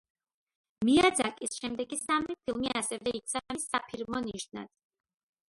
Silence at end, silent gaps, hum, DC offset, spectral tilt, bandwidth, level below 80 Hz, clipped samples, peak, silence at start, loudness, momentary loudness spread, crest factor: 0.8 s; none; none; under 0.1%; -3 dB/octave; 12 kHz; -62 dBFS; under 0.1%; -12 dBFS; 0.8 s; -31 LUFS; 14 LU; 20 dB